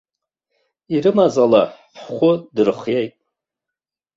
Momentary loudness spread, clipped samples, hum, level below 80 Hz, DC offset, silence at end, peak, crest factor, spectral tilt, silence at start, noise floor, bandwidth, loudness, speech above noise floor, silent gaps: 10 LU; under 0.1%; none; -62 dBFS; under 0.1%; 1.1 s; -2 dBFS; 18 dB; -7 dB/octave; 0.9 s; -86 dBFS; 7.8 kHz; -17 LUFS; 70 dB; none